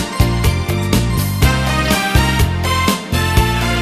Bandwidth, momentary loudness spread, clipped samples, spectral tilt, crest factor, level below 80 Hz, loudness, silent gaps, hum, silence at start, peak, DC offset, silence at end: 14 kHz; 3 LU; under 0.1%; -5 dB/octave; 14 dB; -20 dBFS; -15 LUFS; none; none; 0 s; 0 dBFS; under 0.1%; 0 s